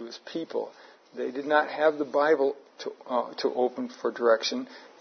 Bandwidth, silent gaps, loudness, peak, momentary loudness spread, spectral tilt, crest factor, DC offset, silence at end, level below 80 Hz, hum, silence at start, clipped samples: 6.6 kHz; none; -27 LUFS; -8 dBFS; 15 LU; -3.5 dB/octave; 20 dB; under 0.1%; 0.15 s; under -90 dBFS; none; 0 s; under 0.1%